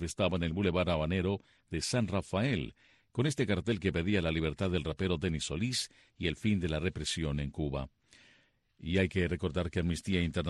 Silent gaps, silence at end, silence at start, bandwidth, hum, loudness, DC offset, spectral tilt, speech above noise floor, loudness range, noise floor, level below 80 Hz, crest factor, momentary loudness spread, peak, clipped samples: none; 0 s; 0 s; 12 kHz; none; -33 LUFS; under 0.1%; -5.5 dB/octave; 36 dB; 2 LU; -68 dBFS; -48 dBFS; 18 dB; 6 LU; -16 dBFS; under 0.1%